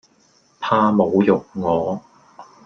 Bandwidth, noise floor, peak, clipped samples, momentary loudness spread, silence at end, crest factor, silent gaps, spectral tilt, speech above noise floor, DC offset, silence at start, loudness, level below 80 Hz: 6.6 kHz; -57 dBFS; -2 dBFS; under 0.1%; 12 LU; 0.2 s; 18 dB; none; -8 dB/octave; 40 dB; under 0.1%; 0.6 s; -19 LUFS; -58 dBFS